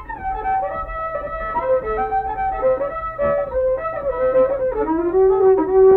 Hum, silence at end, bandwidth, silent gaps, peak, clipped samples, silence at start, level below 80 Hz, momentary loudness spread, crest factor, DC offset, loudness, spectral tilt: none; 0 s; 4.1 kHz; none; -6 dBFS; under 0.1%; 0 s; -38 dBFS; 11 LU; 12 dB; under 0.1%; -19 LUFS; -10 dB/octave